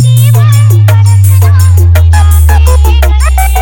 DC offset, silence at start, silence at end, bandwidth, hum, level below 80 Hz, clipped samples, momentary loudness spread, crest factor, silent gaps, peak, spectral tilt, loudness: under 0.1%; 0 s; 0 s; 20 kHz; none; -8 dBFS; 10%; 2 LU; 4 dB; none; 0 dBFS; -5.5 dB/octave; -5 LUFS